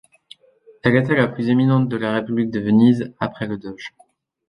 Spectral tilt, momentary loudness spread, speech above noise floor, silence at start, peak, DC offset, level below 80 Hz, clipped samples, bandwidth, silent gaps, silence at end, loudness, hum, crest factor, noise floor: -8.5 dB/octave; 14 LU; 34 dB; 0.85 s; -2 dBFS; under 0.1%; -54 dBFS; under 0.1%; 10 kHz; none; 0.6 s; -19 LUFS; none; 18 dB; -52 dBFS